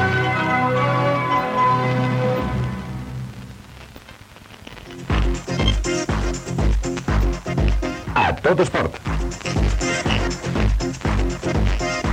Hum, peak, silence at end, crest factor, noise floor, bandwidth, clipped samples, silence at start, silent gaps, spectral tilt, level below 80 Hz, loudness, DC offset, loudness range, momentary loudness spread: none; -4 dBFS; 0 s; 16 dB; -42 dBFS; 10.5 kHz; under 0.1%; 0 s; none; -5.5 dB/octave; -26 dBFS; -21 LUFS; under 0.1%; 6 LU; 19 LU